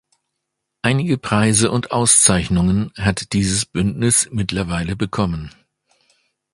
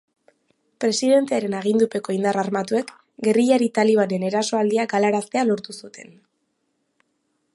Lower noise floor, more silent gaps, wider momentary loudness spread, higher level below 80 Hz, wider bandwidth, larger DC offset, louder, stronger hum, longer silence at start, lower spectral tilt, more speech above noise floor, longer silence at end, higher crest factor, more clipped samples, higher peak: first, -77 dBFS vs -72 dBFS; neither; first, 11 LU vs 8 LU; first, -38 dBFS vs -72 dBFS; about the same, 11.5 kHz vs 11.5 kHz; neither; first, -17 LUFS vs -21 LUFS; neither; about the same, 0.85 s vs 0.8 s; about the same, -4 dB/octave vs -5 dB/octave; first, 60 dB vs 52 dB; second, 1.05 s vs 1.5 s; about the same, 18 dB vs 16 dB; neither; first, 0 dBFS vs -6 dBFS